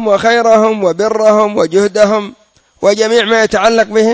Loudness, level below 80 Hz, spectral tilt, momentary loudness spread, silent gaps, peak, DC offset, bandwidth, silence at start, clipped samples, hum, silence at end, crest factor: -10 LUFS; -48 dBFS; -4 dB/octave; 4 LU; none; 0 dBFS; under 0.1%; 8 kHz; 0 s; 0.3%; none; 0 s; 10 dB